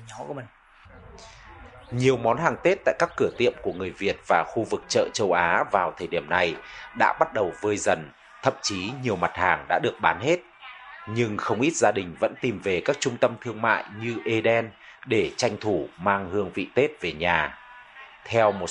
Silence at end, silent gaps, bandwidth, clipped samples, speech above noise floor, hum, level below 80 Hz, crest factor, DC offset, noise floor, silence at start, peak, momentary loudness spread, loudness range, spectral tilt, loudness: 0 s; none; 11 kHz; under 0.1%; 25 dB; none; -56 dBFS; 22 dB; under 0.1%; -49 dBFS; 0 s; -4 dBFS; 14 LU; 2 LU; -4.5 dB/octave; -25 LUFS